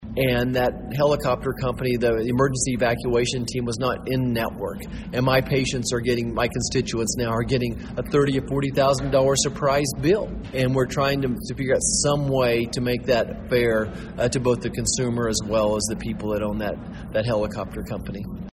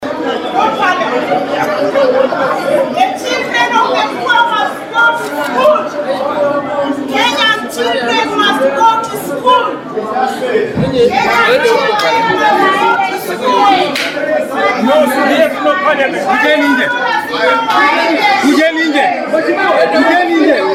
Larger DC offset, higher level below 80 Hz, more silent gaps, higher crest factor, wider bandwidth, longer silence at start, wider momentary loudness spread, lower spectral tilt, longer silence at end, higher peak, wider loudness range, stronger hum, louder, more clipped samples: neither; first, -40 dBFS vs -52 dBFS; neither; first, 18 dB vs 12 dB; about the same, 16 kHz vs 16.5 kHz; about the same, 0 s vs 0 s; about the same, 8 LU vs 6 LU; about the same, -4.5 dB/octave vs -4 dB/octave; about the same, 0 s vs 0 s; second, -6 dBFS vs 0 dBFS; about the same, 2 LU vs 2 LU; neither; second, -23 LUFS vs -11 LUFS; neither